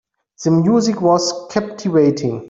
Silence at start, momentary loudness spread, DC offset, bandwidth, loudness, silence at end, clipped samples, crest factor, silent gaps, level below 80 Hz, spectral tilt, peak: 0.4 s; 8 LU; under 0.1%; 7.8 kHz; -16 LUFS; 0 s; under 0.1%; 14 dB; none; -58 dBFS; -6 dB/octave; -2 dBFS